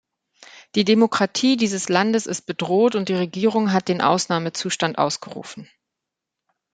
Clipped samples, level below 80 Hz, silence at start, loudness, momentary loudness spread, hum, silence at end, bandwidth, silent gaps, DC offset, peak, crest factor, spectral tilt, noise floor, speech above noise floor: under 0.1%; -66 dBFS; 0.55 s; -20 LUFS; 9 LU; none; 1.1 s; 9.4 kHz; none; under 0.1%; -2 dBFS; 20 dB; -4.5 dB/octave; -84 dBFS; 63 dB